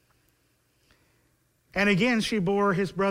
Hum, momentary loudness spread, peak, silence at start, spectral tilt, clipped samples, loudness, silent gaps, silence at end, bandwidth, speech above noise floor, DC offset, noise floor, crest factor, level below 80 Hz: none; 4 LU; -10 dBFS; 1.75 s; -5.5 dB/octave; under 0.1%; -25 LUFS; none; 0 s; 15.5 kHz; 44 dB; under 0.1%; -69 dBFS; 18 dB; -56 dBFS